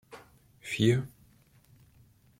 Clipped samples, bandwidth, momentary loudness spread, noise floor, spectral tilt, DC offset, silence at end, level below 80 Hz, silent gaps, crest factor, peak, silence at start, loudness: under 0.1%; 16 kHz; 26 LU; -62 dBFS; -6 dB/octave; under 0.1%; 1.3 s; -64 dBFS; none; 22 dB; -12 dBFS; 0.1 s; -29 LUFS